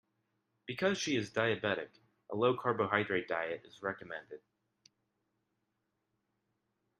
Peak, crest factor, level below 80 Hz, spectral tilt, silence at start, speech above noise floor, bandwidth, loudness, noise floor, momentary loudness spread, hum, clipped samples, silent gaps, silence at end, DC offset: -12 dBFS; 26 dB; -78 dBFS; -4.5 dB/octave; 0.7 s; 49 dB; 12 kHz; -35 LUFS; -84 dBFS; 15 LU; none; under 0.1%; none; 2.6 s; under 0.1%